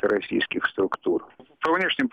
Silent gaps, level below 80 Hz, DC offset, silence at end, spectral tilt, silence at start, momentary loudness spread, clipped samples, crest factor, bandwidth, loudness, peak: none; -62 dBFS; under 0.1%; 0.05 s; -6 dB/octave; 0.05 s; 6 LU; under 0.1%; 16 dB; 8.6 kHz; -25 LUFS; -10 dBFS